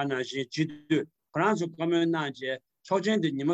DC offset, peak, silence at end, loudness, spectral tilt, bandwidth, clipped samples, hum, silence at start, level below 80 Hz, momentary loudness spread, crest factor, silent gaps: under 0.1%; -12 dBFS; 0 s; -29 LUFS; -6 dB/octave; 8.4 kHz; under 0.1%; none; 0 s; -74 dBFS; 8 LU; 16 dB; none